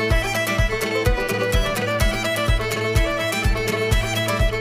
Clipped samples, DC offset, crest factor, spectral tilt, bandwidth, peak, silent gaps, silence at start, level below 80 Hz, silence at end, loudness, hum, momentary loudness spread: under 0.1%; under 0.1%; 14 dB; -4.5 dB/octave; 16 kHz; -6 dBFS; none; 0 s; -24 dBFS; 0 s; -21 LUFS; none; 1 LU